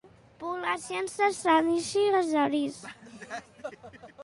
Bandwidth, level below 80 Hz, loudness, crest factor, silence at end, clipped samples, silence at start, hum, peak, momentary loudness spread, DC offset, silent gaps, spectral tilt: 11.5 kHz; -68 dBFS; -27 LUFS; 18 dB; 0 s; under 0.1%; 0.4 s; none; -12 dBFS; 20 LU; under 0.1%; none; -3.5 dB/octave